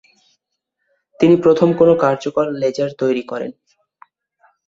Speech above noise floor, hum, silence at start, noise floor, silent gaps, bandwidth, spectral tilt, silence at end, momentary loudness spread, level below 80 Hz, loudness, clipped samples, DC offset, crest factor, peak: 60 dB; none; 1.2 s; -75 dBFS; none; 7.6 kHz; -7.5 dB/octave; 1.15 s; 12 LU; -58 dBFS; -16 LUFS; under 0.1%; under 0.1%; 16 dB; -2 dBFS